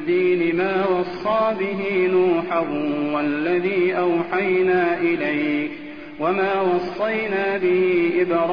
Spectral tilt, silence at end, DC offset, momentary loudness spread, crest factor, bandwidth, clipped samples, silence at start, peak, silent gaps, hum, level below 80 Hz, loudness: -8.5 dB/octave; 0 s; 0.4%; 5 LU; 12 dB; 5.2 kHz; under 0.1%; 0 s; -8 dBFS; none; none; -58 dBFS; -20 LUFS